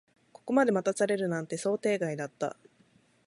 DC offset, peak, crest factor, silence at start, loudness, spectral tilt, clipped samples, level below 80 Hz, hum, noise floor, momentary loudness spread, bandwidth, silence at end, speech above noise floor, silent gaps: under 0.1%; -12 dBFS; 20 dB; 0.45 s; -30 LUFS; -5.5 dB/octave; under 0.1%; -78 dBFS; none; -65 dBFS; 10 LU; 11.5 kHz; 0.75 s; 36 dB; none